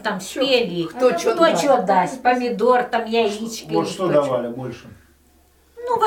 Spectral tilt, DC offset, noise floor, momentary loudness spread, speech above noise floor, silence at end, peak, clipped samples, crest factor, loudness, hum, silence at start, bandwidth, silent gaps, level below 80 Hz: -4.5 dB/octave; under 0.1%; -55 dBFS; 12 LU; 36 dB; 0 s; -2 dBFS; under 0.1%; 18 dB; -19 LUFS; none; 0 s; 17 kHz; none; -58 dBFS